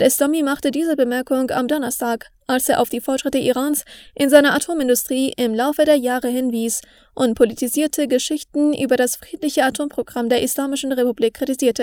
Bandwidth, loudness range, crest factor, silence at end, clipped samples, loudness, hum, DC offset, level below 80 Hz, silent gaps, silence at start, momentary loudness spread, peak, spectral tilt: over 20 kHz; 2 LU; 18 dB; 0 s; under 0.1%; -19 LUFS; none; under 0.1%; -54 dBFS; none; 0 s; 7 LU; 0 dBFS; -3 dB/octave